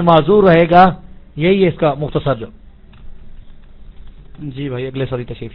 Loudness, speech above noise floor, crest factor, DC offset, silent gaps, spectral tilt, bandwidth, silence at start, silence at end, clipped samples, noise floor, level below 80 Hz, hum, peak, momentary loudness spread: -14 LUFS; 22 dB; 16 dB; under 0.1%; none; -10 dB/octave; 5.4 kHz; 0 s; 0.05 s; 0.1%; -35 dBFS; -36 dBFS; none; 0 dBFS; 22 LU